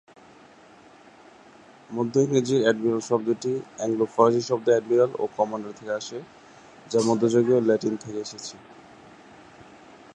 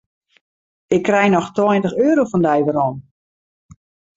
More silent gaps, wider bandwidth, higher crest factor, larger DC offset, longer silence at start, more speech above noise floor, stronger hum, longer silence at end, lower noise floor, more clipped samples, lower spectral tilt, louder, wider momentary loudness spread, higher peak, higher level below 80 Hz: neither; first, 10.5 kHz vs 7.8 kHz; first, 22 dB vs 16 dB; neither; first, 1.9 s vs 0.9 s; second, 28 dB vs over 74 dB; neither; first, 1.4 s vs 1.15 s; second, -51 dBFS vs under -90 dBFS; neither; second, -5.5 dB/octave vs -7 dB/octave; second, -24 LUFS vs -17 LUFS; first, 14 LU vs 6 LU; about the same, -4 dBFS vs -2 dBFS; second, -70 dBFS vs -56 dBFS